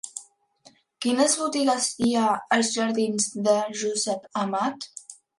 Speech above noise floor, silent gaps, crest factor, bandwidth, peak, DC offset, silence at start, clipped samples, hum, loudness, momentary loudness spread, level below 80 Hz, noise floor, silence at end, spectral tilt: 33 dB; none; 18 dB; 11.5 kHz; -8 dBFS; under 0.1%; 0.05 s; under 0.1%; none; -24 LUFS; 13 LU; -68 dBFS; -58 dBFS; 0.25 s; -3 dB/octave